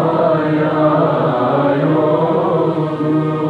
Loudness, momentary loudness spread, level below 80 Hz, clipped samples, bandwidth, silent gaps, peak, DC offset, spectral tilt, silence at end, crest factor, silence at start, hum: -15 LUFS; 3 LU; -58 dBFS; under 0.1%; 5.2 kHz; none; -2 dBFS; under 0.1%; -9.5 dB/octave; 0 s; 12 dB; 0 s; none